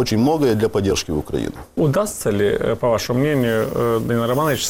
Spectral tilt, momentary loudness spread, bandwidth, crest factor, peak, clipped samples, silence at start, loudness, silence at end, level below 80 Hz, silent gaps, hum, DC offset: -5.5 dB/octave; 5 LU; 17 kHz; 12 dB; -8 dBFS; under 0.1%; 0 s; -19 LUFS; 0 s; -40 dBFS; none; none; under 0.1%